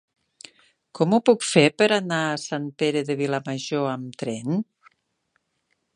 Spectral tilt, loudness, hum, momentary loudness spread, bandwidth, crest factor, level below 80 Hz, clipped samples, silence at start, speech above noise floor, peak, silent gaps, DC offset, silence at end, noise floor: -5 dB/octave; -23 LUFS; none; 12 LU; 11.5 kHz; 22 dB; -72 dBFS; under 0.1%; 0.95 s; 51 dB; -2 dBFS; none; under 0.1%; 1.35 s; -73 dBFS